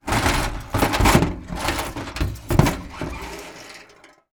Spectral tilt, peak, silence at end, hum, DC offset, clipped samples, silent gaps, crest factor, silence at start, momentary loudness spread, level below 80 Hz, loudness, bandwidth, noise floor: -5 dB/octave; 0 dBFS; 0.5 s; none; under 0.1%; under 0.1%; none; 22 dB; 0.05 s; 19 LU; -30 dBFS; -22 LUFS; over 20 kHz; -50 dBFS